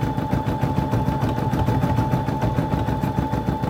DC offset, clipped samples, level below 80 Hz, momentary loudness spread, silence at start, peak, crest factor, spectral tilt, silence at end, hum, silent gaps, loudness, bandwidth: under 0.1%; under 0.1%; -34 dBFS; 2 LU; 0 s; -6 dBFS; 14 dB; -8 dB/octave; 0 s; none; none; -22 LUFS; 16.5 kHz